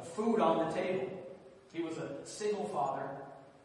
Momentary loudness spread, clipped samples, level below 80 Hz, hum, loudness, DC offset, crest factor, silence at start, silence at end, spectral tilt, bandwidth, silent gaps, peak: 17 LU; under 0.1%; -76 dBFS; none; -35 LUFS; under 0.1%; 18 dB; 0 s; 0.1 s; -5.5 dB/octave; 11.5 kHz; none; -18 dBFS